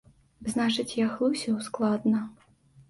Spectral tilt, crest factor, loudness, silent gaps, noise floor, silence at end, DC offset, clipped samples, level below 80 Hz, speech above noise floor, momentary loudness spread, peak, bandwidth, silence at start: -5 dB/octave; 14 dB; -28 LUFS; none; -58 dBFS; 0.1 s; under 0.1%; under 0.1%; -64 dBFS; 31 dB; 6 LU; -14 dBFS; 11.5 kHz; 0.4 s